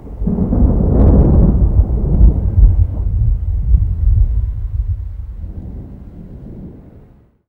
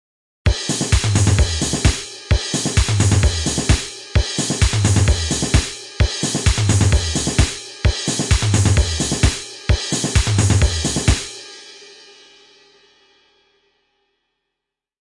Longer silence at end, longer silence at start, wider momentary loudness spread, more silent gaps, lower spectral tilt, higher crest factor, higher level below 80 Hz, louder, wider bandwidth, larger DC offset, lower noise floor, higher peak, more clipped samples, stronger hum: second, 0.65 s vs 3.25 s; second, 0 s vs 0.45 s; first, 22 LU vs 6 LU; neither; first, -13.5 dB/octave vs -4 dB/octave; about the same, 14 dB vs 16 dB; first, -14 dBFS vs -24 dBFS; first, -15 LUFS vs -18 LUFS; second, 1.7 kHz vs 11.5 kHz; neither; second, -45 dBFS vs -82 dBFS; about the same, 0 dBFS vs -2 dBFS; first, 0.1% vs under 0.1%; neither